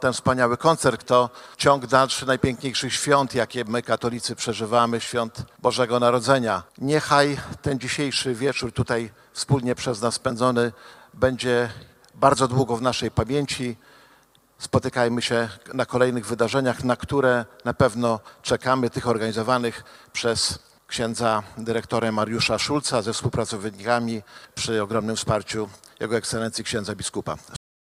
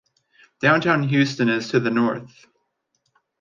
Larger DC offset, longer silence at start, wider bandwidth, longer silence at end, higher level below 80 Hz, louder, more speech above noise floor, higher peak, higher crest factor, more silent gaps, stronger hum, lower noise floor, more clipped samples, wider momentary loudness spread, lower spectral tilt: neither; second, 0 s vs 0.6 s; first, 15.5 kHz vs 7.4 kHz; second, 0.4 s vs 1.15 s; first, -50 dBFS vs -64 dBFS; second, -23 LUFS vs -20 LUFS; second, 34 dB vs 52 dB; first, 0 dBFS vs -4 dBFS; first, 24 dB vs 18 dB; neither; neither; second, -58 dBFS vs -73 dBFS; neither; first, 10 LU vs 5 LU; second, -4.5 dB/octave vs -6 dB/octave